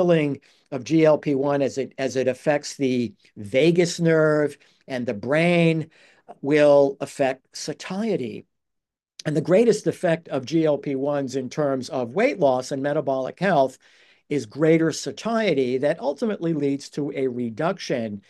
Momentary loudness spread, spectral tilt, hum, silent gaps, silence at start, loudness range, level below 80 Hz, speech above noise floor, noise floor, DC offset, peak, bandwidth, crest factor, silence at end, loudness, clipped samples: 11 LU; -6 dB/octave; none; none; 0 s; 2 LU; -72 dBFS; 61 dB; -83 dBFS; under 0.1%; -6 dBFS; 12.5 kHz; 18 dB; 0.1 s; -23 LUFS; under 0.1%